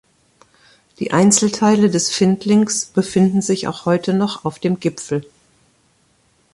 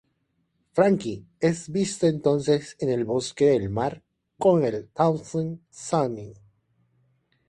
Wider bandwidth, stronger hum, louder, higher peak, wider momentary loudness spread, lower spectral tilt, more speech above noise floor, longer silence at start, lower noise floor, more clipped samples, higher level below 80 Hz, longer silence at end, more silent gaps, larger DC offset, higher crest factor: about the same, 11.5 kHz vs 11.5 kHz; neither; first, -17 LUFS vs -25 LUFS; first, -2 dBFS vs -6 dBFS; about the same, 9 LU vs 9 LU; about the same, -5 dB/octave vs -6 dB/octave; second, 43 dB vs 49 dB; first, 1 s vs 0.75 s; second, -59 dBFS vs -73 dBFS; neither; about the same, -56 dBFS vs -58 dBFS; first, 1.3 s vs 1.15 s; neither; neither; about the same, 16 dB vs 20 dB